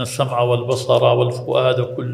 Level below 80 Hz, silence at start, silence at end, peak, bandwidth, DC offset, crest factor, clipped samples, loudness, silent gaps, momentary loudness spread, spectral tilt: -58 dBFS; 0 s; 0 s; -2 dBFS; 15 kHz; under 0.1%; 16 dB; under 0.1%; -18 LUFS; none; 5 LU; -6 dB/octave